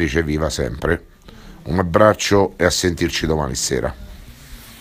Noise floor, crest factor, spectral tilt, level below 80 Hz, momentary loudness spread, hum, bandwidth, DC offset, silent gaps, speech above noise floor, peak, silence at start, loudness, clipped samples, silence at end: -40 dBFS; 20 dB; -4.5 dB/octave; -34 dBFS; 15 LU; none; 16 kHz; under 0.1%; none; 22 dB; 0 dBFS; 0 s; -18 LUFS; under 0.1%; 0 s